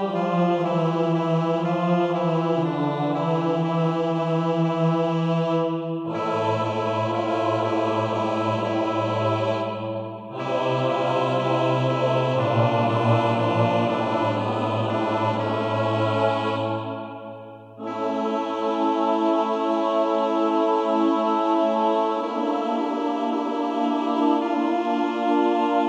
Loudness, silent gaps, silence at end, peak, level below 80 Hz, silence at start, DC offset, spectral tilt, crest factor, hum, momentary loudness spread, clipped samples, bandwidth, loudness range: -23 LUFS; none; 0 s; -8 dBFS; -70 dBFS; 0 s; under 0.1%; -7.5 dB/octave; 16 dB; none; 5 LU; under 0.1%; 8.6 kHz; 3 LU